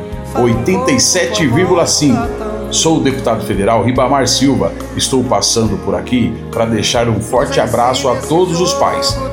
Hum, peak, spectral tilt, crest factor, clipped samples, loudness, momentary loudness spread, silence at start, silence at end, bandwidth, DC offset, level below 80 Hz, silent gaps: none; 0 dBFS; -4 dB/octave; 12 dB; under 0.1%; -13 LUFS; 6 LU; 0 s; 0 s; 17 kHz; under 0.1%; -32 dBFS; none